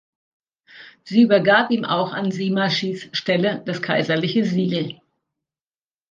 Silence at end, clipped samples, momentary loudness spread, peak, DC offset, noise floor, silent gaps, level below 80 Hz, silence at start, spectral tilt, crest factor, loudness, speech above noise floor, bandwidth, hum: 1.2 s; under 0.1%; 10 LU; -2 dBFS; under 0.1%; under -90 dBFS; none; -68 dBFS; 0.75 s; -6 dB/octave; 20 dB; -20 LUFS; over 70 dB; 7.4 kHz; none